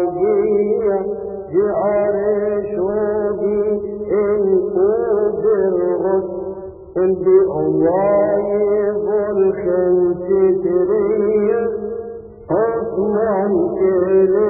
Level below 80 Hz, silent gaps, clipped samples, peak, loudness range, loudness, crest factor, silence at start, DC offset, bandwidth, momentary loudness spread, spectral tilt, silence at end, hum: -48 dBFS; none; under 0.1%; -2 dBFS; 2 LU; -17 LUFS; 14 dB; 0 s; under 0.1%; 2.6 kHz; 7 LU; -15.5 dB/octave; 0 s; none